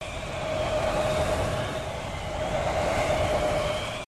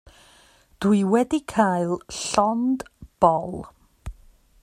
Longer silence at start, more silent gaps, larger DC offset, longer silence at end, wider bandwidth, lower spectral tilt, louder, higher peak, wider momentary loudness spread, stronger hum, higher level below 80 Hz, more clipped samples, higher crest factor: second, 0 s vs 0.8 s; neither; first, 0.1% vs under 0.1%; second, 0 s vs 0.5 s; about the same, 14 kHz vs 14 kHz; about the same, -4.5 dB/octave vs -5.5 dB/octave; second, -28 LUFS vs -22 LUFS; second, -14 dBFS vs -2 dBFS; second, 7 LU vs 22 LU; neither; first, -38 dBFS vs -48 dBFS; neither; second, 14 dB vs 22 dB